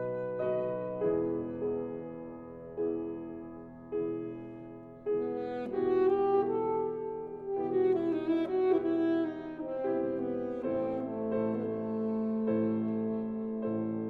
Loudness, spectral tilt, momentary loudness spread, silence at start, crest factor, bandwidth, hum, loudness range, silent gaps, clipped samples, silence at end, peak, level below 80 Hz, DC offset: -33 LUFS; -10 dB/octave; 13 LU; 0 s; 16 dB; 4.5 kHz; none; 7 LU; none; under 0.1%; 0 s; -16 dBFS; -66 dBFS; under 0.1%